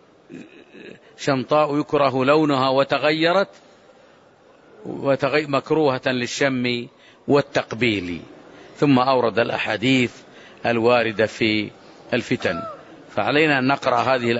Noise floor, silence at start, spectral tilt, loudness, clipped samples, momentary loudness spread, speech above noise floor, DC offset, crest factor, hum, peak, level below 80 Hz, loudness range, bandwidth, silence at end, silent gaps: -52 dBFS; 0.3 s; -5.5 dB/octave; -20 LUFS; under 0.1%; 13 LU; 32 dB; under 0.1%; 16 dB; none; -4 dBFS; -60 dBFS; 3 LU; 8 kHz; 0 s; none